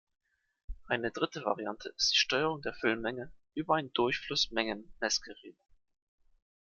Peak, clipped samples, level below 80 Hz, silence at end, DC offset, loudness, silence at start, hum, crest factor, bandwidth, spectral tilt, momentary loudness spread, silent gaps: -14 dBFS; under 0.1%; -58 dBFS; 1.15 s; under 0.1%; -32 LUFS; 0.7 s; none; 22 dB; 7.6 kHz; -2.5 dB/octave; 14 LU; none